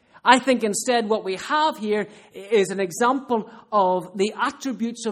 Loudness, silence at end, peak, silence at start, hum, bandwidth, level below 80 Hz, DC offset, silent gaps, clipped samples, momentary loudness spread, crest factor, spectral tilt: -22 LUFS; 0 s; 0 dBFS; 0.25 s; none; 15 kHz; -68 dBFS; under 0.1%; none; under 0.1%; 9 LU; 22 dB; -3.5 dB/octave